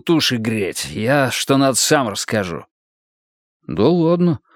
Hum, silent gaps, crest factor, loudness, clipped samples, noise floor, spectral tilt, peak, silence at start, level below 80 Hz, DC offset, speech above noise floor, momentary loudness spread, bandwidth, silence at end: none; 2.71-3.60 s; 18 dB; -17 LUFS; under 0.1%; under -90 dBFS; -4.5 dB/octave; 0 dBFS; 0.05 s; -54 dBFS; under 0.1%; over 73 dB; 8 LU; 18 kHz; 0.2 s